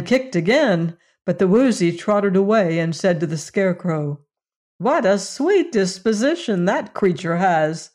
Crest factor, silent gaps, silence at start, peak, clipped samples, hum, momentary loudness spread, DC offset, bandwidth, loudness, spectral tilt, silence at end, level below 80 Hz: 12 dB; 4.56-4.79 s; 0 s; -8 dBFS; under 0.1%; none; 7 LU; under 0.1%; 11 kHz; -19 LUFS; -6 dB/octave; 0.1 s; -62 dBFS